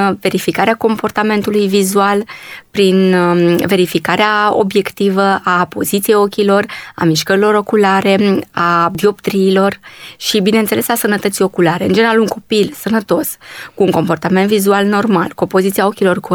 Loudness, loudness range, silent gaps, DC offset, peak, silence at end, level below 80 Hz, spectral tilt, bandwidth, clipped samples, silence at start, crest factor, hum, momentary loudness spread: -13 LUFS; 2 LU; none; under 0.1%; 0 dBFS; 0 s; -54 dBFS; -5 dB/octave; over 20 kHz; under 0.1%; 0 s; 12 dB; none; 5 LU